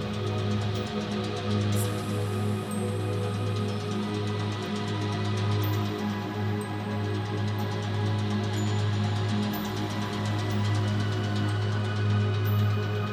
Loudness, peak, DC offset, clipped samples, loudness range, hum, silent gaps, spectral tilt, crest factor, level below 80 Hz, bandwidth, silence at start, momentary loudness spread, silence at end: -29 LUFS; -16 dBFS; under 0.1%; under 0.1%; 2 LU; none; none; -6.5 dB/octave; 12 dB; -54 dBFS; 15 kHz; 0 s; 4 LU; 0 s